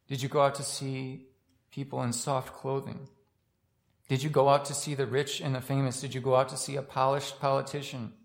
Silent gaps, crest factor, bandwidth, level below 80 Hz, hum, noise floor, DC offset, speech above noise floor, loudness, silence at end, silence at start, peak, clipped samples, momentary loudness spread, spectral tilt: none; 20 dB; 16.5 kHz; -72 dBFS; none; -74 dBFS; under 0.1%; 44 dB; -30 LUFS; 0.1 s; 0.1 s; -10 dBFS; under 0.1%; 12 LU; -5 dB/octave